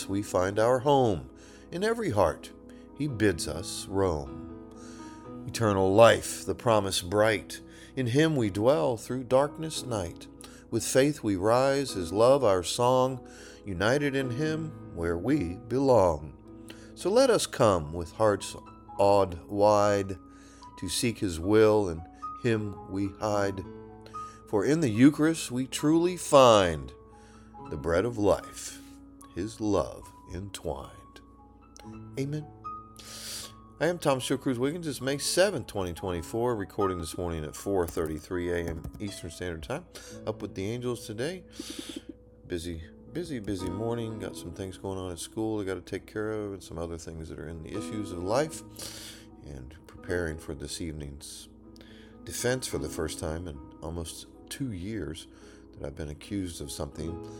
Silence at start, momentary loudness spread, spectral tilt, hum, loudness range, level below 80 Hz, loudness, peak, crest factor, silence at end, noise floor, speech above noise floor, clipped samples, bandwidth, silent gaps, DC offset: 0 s; 19 LU; -5 dB/octave; none; 11 LU; -52 dBFS; -28 LUFS; -4 dBFS; 24 dB; 0 s; -54 dBFS; 26 dB; under 0.1%; 19 kHz; none; under 0.1%